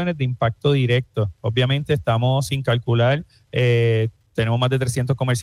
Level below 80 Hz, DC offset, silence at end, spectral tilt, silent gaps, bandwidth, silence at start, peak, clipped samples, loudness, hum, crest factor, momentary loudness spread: -48 dBFS; under 0.1%; 0 s; -6 dB/octave; none; 12.5 kHz; 0 s; -6 dBFS; under 0.1%; -20 LUFS; none; 14 dB; 6 LU